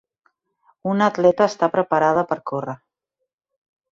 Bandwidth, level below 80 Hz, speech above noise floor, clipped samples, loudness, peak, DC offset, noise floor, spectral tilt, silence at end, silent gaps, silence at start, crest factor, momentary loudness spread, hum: 7.6 kHz; -66 dBFS; 61 dB; under 0.1%; -20 LUFS; -4 dBFS; under 0.1%; -80 dBFS; -6.5 dB/octave; 1.2 s; none; 0.85 s; 18 dB; 13 LU; none